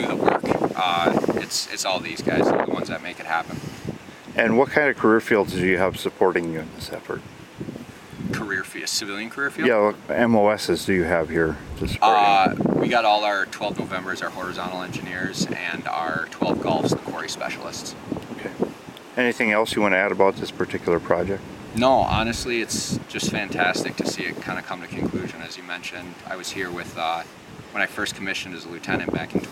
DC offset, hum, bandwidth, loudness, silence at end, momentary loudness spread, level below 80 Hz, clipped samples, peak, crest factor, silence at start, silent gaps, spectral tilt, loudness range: under 0.1%; none; 16 kHz; -23 LUFS; 0 s; 14 LU; -50 dBFS; under 0.1%; -2 dBFS; 22 dB; 0 s; none; -4.5 dB/octave; 8 LU